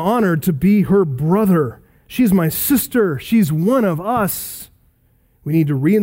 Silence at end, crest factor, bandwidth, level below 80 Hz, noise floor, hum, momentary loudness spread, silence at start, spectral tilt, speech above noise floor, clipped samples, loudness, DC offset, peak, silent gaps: 0 s; 14 dB; 16.5 kHz; -46 dBFS; -57 dBFS; none; 10 LU; 0 s; -6.5 dB/octave; 42 dB; under 0.1%; -16 LUFS; under 0.1%; -2 dBFS; none